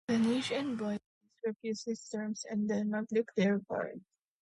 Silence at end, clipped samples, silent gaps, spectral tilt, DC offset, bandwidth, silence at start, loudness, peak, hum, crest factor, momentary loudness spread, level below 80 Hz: 0.4 s; under 0.1%; 1.06-1.21 s, 1.56-1.60 s; -5.5 dB/octave; under 0.1%; 11.5 kHz; 0.1 s; -35 LUFS; -20 dBFS; none; 16 dB; 10 LU; -76 dBFS